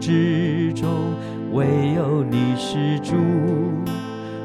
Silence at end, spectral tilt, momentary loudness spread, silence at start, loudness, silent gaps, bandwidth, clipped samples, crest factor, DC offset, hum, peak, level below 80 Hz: 0 s; -7.5 dB/octave; 7 LU; 0 s; -21 LUFS; none; 13.5 kHz; under 0.1%; 14 dB; under 0.1%; none; -6 dBFS; -54 dBFS